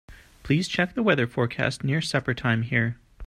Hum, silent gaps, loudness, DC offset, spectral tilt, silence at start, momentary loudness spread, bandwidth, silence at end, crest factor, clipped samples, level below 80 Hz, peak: none; none; -25 LUFS; under 0.1%; -6 dB/octave; 0.1 s; 4 LU; 12.5 kHz; 0 s; 20 dB; under 0.1%; -52 dBFS; -6 dBFS